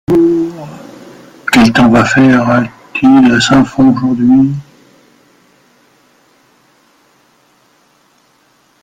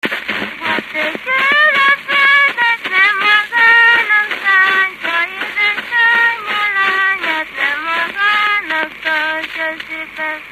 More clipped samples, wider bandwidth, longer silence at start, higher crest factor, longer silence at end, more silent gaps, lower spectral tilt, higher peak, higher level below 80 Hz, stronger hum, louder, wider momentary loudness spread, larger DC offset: neither; second, 13 kHz vs 14.5 kHz; about the same, 0.1 s vs 0.05 s; about the same, 12 dB vs 14 dB; first, 4.2 s vs 0 s; neither; first, -5.5 dB/octave vs -2 dB/octave; about the same, 0 dBFS vs 0 dBFS; first, -42 dBFS vs -58 dBFS; neither; first, -9 LUFS vs -12 LUFS; first, 16 LU vs 10 LU; neither